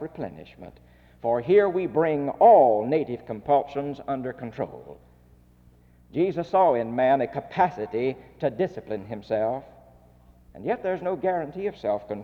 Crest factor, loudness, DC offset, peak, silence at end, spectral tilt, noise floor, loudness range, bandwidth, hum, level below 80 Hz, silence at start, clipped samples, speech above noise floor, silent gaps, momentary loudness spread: 18 dB; -24 LUFS; under 0.1%; -6 dBFS; 0 s; -8.5 dB/octave; -56 dBFS; 8 LU; 6.4 kHz; 60 Hz at -65 dBFS; -58 dBFS; 0 s; under 0.1%; 31 dB; none; 15 LU